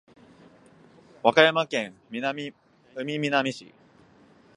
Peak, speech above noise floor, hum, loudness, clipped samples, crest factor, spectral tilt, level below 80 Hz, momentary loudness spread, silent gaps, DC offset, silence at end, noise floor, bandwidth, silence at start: -2 dBFS; 32 dB; none; -25 LUFS; under 0.1%; 26 dB; -4.5 dB/octave; -74 dBFS; 19 LU; none; under 0.1%; 0.95 s; -56 dBFS; 11 kHz; 1.25 s